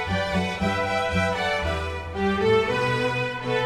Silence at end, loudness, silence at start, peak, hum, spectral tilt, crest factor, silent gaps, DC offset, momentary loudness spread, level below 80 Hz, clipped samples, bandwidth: 0 s; -24 LUFS; 0 s; -10 dBFS; none; -5.5 dB/octave; 14 dB; none; under 0.1%; 6 LU; -42 dBFS; under 0.1%; 15 kHz